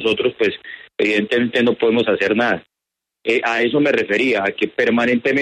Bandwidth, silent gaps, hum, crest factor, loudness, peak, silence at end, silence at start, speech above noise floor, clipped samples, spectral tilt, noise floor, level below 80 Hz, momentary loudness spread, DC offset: 9.6 kHz; none; none; 14 dB; -17 LUFS; -4 dBFS; 0 s; 0 s; 66 dB; under 0.1%; -5.5 dB/octave; -83 dBFS; -60 dBFS; 5 LU; under 0.1%